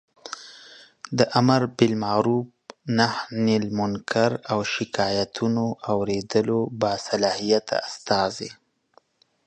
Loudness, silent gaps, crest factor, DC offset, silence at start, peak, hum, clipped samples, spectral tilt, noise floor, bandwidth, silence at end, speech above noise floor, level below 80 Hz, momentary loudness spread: -23 LUFS; none; 20 dB; under 0.1%; 0.25 s; -4 dBFS; none; under 0.1%; -5.5 dB/octave; -61 dBFS; 9.2 kHz; 0.9 s; 38 dB; -58 dBFS; 17 LU